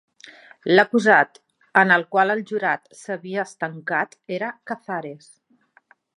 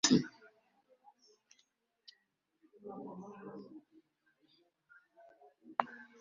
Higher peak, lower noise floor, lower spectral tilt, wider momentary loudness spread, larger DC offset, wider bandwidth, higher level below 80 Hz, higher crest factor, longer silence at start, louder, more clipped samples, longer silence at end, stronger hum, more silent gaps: first, 0 dBFS vs -10 dBFS; second, -60 dBFS vs -80 dBFS; first, -5.5 dB/octave vs -3.5 dB/octave; second, 15 LU vs 27 LU; neither; first, 11 kHz vs 7 kHz; about the same, -76 dBFS vs -78 dBFS; second, 22 dB vs 32 dB; first, 0.25 s vs 0.05 s; first, -21 LUFS vs -39 LUFS; neither; first, 1 s vs 0.15 s; neither; neither